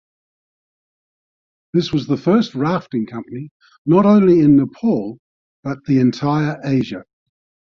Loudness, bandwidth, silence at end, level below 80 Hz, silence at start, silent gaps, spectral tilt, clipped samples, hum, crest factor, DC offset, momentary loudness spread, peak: -17 LUFS; 7 kHz; 0.75 s; -54 dBFS; 1.75 s; 3.51-3.60 s, 3.78-3.85 s, 5.19-5.63 s; -8.5 dB/octave; under 0.1%; none; 16 dB; under 0.1%; 19 LU; -2 dBFS